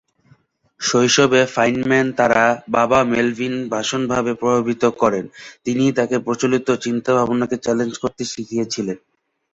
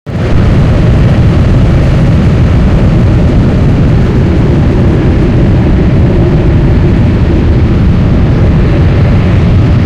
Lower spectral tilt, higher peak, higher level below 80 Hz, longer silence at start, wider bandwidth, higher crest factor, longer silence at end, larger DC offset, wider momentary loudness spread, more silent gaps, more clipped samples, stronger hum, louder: second, -4 dB/octave vs -9 dB/octave; about the same, -2 dBFS vs 0 dBFS; second, -54 dBFS vs -12 dBFS; first, 0.8 s vs 0.05 s; about the same, 8 kHz vs 8 kHz; first, 18 dB vs 6 dB; first, 0.55 s vs 0 s; neither; first, 10 LU vs 1 LU; neither; neither; neither; second, -18 LUFS vs -7 LUFS